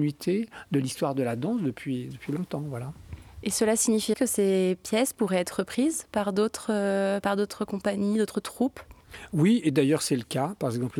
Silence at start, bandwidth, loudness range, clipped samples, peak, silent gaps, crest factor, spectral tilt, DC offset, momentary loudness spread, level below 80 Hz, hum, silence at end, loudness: 0 s; 18.5 kHz; 4 LU; under 0.1%; -10 dBFS; none; 16 dB; -5 dB/octave; under 0.1%; 10 LU; -58 dBFS; none; 0 s; -27 LUFS